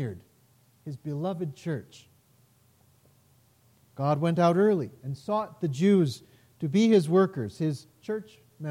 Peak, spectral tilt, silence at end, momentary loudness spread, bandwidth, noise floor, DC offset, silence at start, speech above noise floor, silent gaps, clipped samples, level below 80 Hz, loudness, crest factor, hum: -10 dBFS; -7.5 dB/octave; 0 s; 17 LU; 15.5 kHz; -63 dBFS; under 0.1%; 0 s; 37 dB; none; under 0.1%; -72 dBFS; -27 LUFS; 18 dB; none